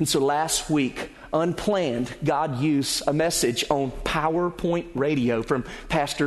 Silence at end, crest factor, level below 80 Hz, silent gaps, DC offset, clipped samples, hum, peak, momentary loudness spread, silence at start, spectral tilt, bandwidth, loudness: 0 s; 18 dB; -44 dBFS; none; under 0.1%; under 0.1%; none; -6 dBFS; 5 LU; 0 s; -4.5 dB/octave; 12.5 kHz; -24 LUFS